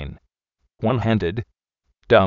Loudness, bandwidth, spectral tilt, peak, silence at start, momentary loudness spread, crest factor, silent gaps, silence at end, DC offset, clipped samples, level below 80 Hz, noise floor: -22 LUFS; 7 kHz; -5.5 dB/octave; 0 dBFS; 0 s; 17 LU; 22 dB; none; 0 s; under 0.1%; under 0.1%; -44 dBFS; -73 dBFS